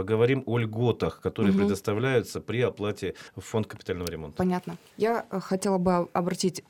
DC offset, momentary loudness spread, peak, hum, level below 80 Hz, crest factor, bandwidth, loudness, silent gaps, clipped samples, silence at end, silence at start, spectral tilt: under 0.1%; 9 LU; -10 dBFS; none; -60 dBFS; 16 dB; 17.5 kHz; -28 LUFS; none; under 0.1%; 0.1 s; 0 s; -6 dB/octave